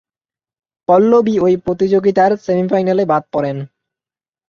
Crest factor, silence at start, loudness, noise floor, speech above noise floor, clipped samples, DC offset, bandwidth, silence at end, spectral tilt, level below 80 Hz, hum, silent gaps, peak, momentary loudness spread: 14 dB; 0.9 s; -14 LUFS; under -90 dBFS; over 77 dB; under 0.1%; under 0.1%; 7 kHz; 0.85 s; -8 dB/octave; -54 dBFS; none; none; -2 dBFS; 11 LU